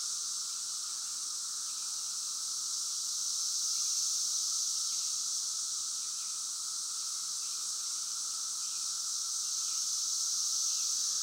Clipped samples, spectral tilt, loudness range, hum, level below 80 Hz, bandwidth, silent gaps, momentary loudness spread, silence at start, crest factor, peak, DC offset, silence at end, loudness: under 0.1%; 4.5 dB/octave; 3 LU; none; under -90 dBFS; 16 kHz; none; 5 LU; 0 s; 14 dB; -20 dBFS; under 0.1%; 0 s; -32 LUFS